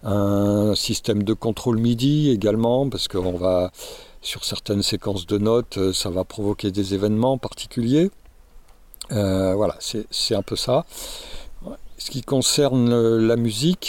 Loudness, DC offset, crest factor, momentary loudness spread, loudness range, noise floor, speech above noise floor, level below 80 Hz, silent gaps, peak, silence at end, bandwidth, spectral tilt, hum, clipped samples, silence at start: -21 LUFS; under 0.1%; 16 dB; 15 LU; 3 LU; -46 dBFS; 25 dB; -44 dBFS; none; -6 dBFS; 0 s; 17 kHz; -5.5 dB/octave; none; under 0.1%; 0.05 s